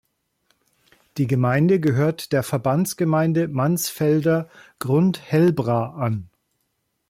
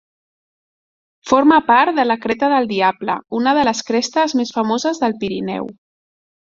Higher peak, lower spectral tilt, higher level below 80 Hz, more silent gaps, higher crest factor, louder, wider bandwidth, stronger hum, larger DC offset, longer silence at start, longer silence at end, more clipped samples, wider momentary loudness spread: second, -8 dBFS vs 0 dBFS; first, -6.5 dB/octave vs -4 dB/octave; about the same, -60 dBFS vs -58 dBFS; neither; about the same, 14 dB vs 16 dB; second, -21 LUFS vs -17 LUFS; first, 16.5 kHz vs 7.6 kHz; neither; neither; about the same, 1.15 s vs 1.25 s; about the same, 0.85 s vs 0.8 s; neither; second, 8 LU vs 11 LU